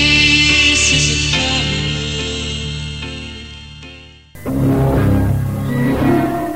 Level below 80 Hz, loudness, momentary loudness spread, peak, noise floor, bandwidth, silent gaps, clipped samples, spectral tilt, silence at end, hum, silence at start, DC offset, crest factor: -28 dBFS; -14 LUFS; 20 LU; 0 dBFS; -38 dBFS; 16 kHz; none; under 0.1%; -3.5 dB/octave; 0 s; none; 0 s; under 0.1%; 16 dB